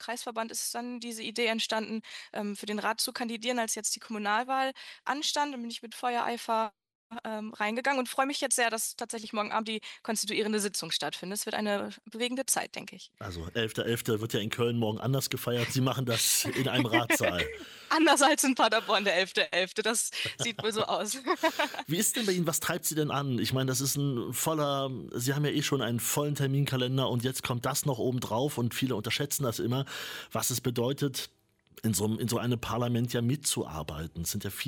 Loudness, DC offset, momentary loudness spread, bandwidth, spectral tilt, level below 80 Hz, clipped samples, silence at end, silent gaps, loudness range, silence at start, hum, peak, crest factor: -30 LUFS; under 0.1%; 10 LU; 17.5 kHz; -3.5 dB/octave; -62 dBFS; under 0.1%; 0 s; 6.95-7.10 s; 6 LU; 0 s; none; -10 dBFS; 22 dB